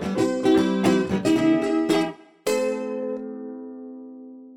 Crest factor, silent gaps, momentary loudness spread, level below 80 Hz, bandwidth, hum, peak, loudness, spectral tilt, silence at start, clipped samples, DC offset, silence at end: 16 dB; none; 19 LU; -58 dBFS; 16 kHz; none; -8 dBFS; -23 LUFS; -5.5 dB/octave; 0 s; under 0.1%; under 0.1%; 0 s